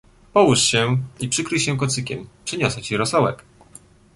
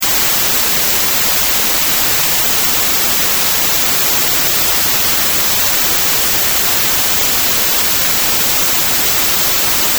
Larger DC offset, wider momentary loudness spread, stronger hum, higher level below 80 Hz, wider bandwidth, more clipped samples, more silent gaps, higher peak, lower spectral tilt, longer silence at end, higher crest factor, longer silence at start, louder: neither; first, 13 LU vs 0 LU; neither; second, -50 dBFS vs -38 dBFS; second, 11.5 kHz vs over 20 kHz; neither; neither; about the same, -2 dBFS vs 0 dBFS; first, -4 dB/octave vs 0 dB/octave; first, 0.8 s vs 0 s; first, 20 dB vs 12 dB; first, 0.35 s vs 0 s; second, -20 LUFS vs -10 LUFS